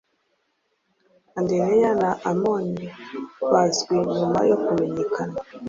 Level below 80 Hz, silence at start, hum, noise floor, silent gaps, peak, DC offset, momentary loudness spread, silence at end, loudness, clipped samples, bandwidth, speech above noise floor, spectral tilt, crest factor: -60 dBFS; 1.35 s; none; -71 dBFS; none; -6 dBFS; under 0.1%; 13 LU; 0 s; -22 LUFS; under 0.1%; 7.8 kHz; 49 dB; -5.5 dB/octave; 18 dB